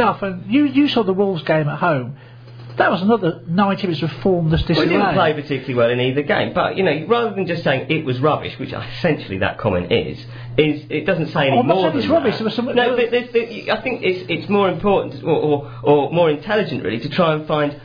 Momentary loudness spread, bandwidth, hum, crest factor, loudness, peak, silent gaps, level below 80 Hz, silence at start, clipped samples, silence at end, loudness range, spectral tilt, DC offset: 6 LU; 5.2 kHz; none; 16 dB; -18 LUFS; -2 dBFS; none; -44 dBFS; 0 s; under 0.1%; 0 s; 2 LU; -8.5 dB/octave; under 0.1%